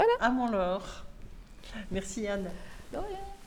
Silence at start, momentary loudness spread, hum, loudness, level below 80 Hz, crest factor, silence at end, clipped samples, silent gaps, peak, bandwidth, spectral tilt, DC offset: 0 s; 23 LU; none; -33 LUFS; -46 dBFS; 18 dB; 0 s; under 0.1%; none; -14 dBFS; 17 kHz; -5 dB/octave; under 0.1%